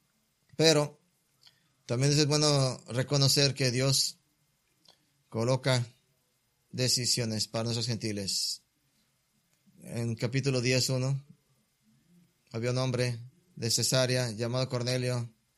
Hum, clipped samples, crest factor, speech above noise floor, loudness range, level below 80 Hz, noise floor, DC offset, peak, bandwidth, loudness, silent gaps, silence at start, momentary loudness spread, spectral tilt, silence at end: none; under 0.1%; 22 dB; 45 dB; 6 LU; -66 dBFS; -74 dBFS; under 0.1%; -8 dBFS; 14.5 kHz; -28 LUFS; none; 0.6 s; 12 LU; -4 dB/octave; 0.3 s